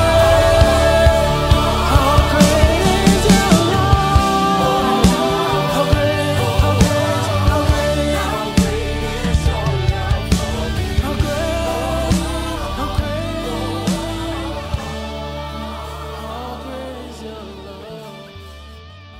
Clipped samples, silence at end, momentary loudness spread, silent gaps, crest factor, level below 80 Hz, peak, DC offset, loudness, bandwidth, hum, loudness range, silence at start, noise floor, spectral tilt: under 0.1%; 0 s; 16 LU; none; 16 dB; -24 dBFS; 0 dBFS; under 0.1%; -16 LUFS; 16 kHz; none; 14 LU; 0 s; -37 dBFS; -5.5 dB/octave